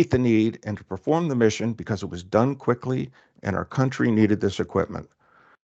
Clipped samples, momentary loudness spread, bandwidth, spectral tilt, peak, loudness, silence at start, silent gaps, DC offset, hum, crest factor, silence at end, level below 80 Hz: under 0.1%; 11 LU; 8 kHz; -7 dB/octave; -6 dBFS; -24 LUFS; 0 s; none; under 0.1%; none; 18 dB; 0.6 s; -56 dBFS